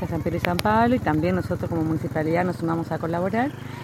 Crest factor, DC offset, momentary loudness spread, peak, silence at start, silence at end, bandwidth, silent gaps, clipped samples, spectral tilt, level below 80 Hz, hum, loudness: 22 dB; under 0.1%; 6 LU; 0 dBFS; 0 s; 0 s; 16.5 kHz; none; under 0.1%; -7 dB/octave; -46 dBFS; none; -24 LUFS